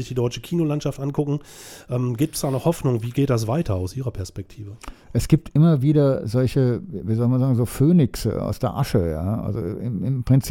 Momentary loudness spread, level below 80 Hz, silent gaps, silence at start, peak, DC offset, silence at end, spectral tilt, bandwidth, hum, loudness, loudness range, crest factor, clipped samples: 12 LU; -42 dBFS; none; 0 s; -2 dBFS; under 0.1%; 0 s; -7.5 dB/octave; 16.5 kHz; none; -22 LUFS; 5 LU; 18 dB; under 0.1%